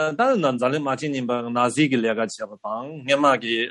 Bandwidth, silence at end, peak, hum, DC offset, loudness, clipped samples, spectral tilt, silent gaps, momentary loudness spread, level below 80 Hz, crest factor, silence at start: 11.5 kHz; 0 s; -4 dBFS; none; under 0.1%; -22 LUFS; under 0.1%; -5 dB/octave; none; 11 LU; -70 dBFS; 18 dB; 0 s